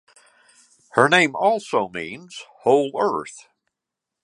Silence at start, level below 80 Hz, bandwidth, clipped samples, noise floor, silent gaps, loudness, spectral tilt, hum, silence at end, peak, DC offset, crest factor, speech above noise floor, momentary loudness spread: 0.95 s; -68 dBFS; 11.5 kHz; under 0.1%; -85 dBFS; none; -20 LUFS; -4 dB/octave; none; 0.85 s; 0 dBFS; under 0.1%; 22 dB; 64 dB; 18 LU